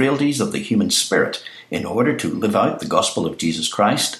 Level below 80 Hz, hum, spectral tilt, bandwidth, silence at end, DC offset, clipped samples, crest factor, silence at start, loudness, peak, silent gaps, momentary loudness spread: -58 dBFS; none; -3.5 dB/octave; 15 kHz; 0 s; under 0.1%; under 0.1%; 18 dB; 0 s; -19 LUFS; -2 dBFS; none; 7 LU